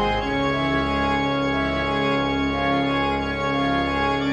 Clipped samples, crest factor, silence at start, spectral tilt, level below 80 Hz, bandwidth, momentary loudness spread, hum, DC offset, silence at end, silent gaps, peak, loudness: under 0.1%; 12 dB; 0 s; -6 dB/octave; -36 dBFS; 8.8 kHz; 1 LU; none; under 0.1%; 0 s; none; -10 dBFS; -22 LUFS